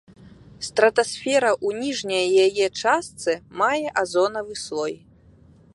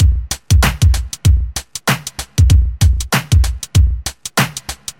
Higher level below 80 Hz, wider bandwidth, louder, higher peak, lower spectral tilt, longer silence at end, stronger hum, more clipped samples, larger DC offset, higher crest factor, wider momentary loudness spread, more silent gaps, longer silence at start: second, -60 dBFS vs -16 dBFS; second, 11.5 kHz vs 16.5 kHz; second, -22 LUFS vs -15 LUFS; about the same, -2 dBFS vs 0 dBFS; second, -3 dB/octave vs -4.5 dB/octave; first, 0.8 s vs 0.1 s; neither; neither; neither; first, 20 dB vs 14 dB; about the same, 10 LU vs 8 LU; neither; first, 0.25 s vs 0 s